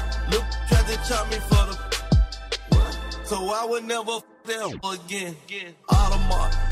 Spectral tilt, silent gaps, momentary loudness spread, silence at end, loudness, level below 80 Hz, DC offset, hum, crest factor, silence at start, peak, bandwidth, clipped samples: -5 dB/octave; none; 10 LU; 0 s; -25 LUFS; -26 dBFS; under 0.1%; none; 16 dB; 0 s; -6 dBFS; 15 kHz; under 0.1%